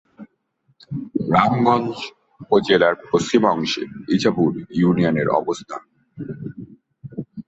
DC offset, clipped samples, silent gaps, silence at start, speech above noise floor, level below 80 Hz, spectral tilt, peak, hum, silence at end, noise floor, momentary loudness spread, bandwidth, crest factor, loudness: under 0.1%; under 0.1%; none; 0.2 s; 46 dB; -56 dBFS; -6 dB/octave; -2 dBFS; none; 0.05 s; -65 dBFS; 18 LU; 8.2 kHz; 18 dB; -19 LUFS